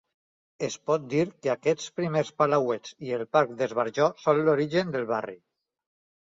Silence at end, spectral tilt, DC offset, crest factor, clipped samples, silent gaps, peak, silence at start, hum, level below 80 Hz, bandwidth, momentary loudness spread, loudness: 0.85 s; -5.5 dB/octave; under 0.1%; 20 dB; under 0.1%; none; -6 dBFS; 0.6 s; none; -70 dBFS; 7.8 kHz; 9 LU; -27 LUFS